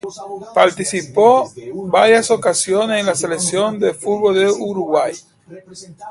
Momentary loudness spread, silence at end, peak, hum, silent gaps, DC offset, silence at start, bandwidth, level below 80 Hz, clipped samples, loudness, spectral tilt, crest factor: 16 LU; 0 s; 0 dBFS; none; none; under 0.1%; 0.05 s; 11.5 kHz; -60 dBFS; under 0.1%; -16 LUFS; -3.5 dB/octave; 16 dB